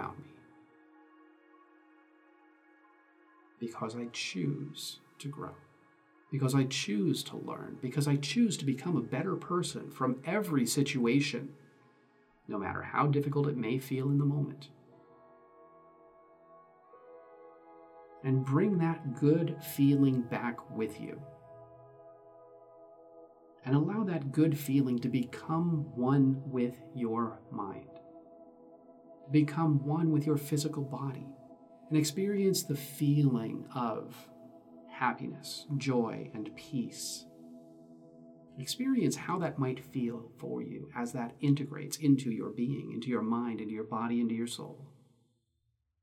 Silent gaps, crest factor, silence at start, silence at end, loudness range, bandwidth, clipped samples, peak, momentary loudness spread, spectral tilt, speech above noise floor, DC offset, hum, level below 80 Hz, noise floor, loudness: none; 18 dB; 0 s; 1.15 s; 9 LU; 16.5 kHz; under 0.1%; -16 dBFS; 15 LU; -6 dB/octave; 48 dB; under 0.1%; none; -78 dBFS; -79 dBFS; -33 LUFS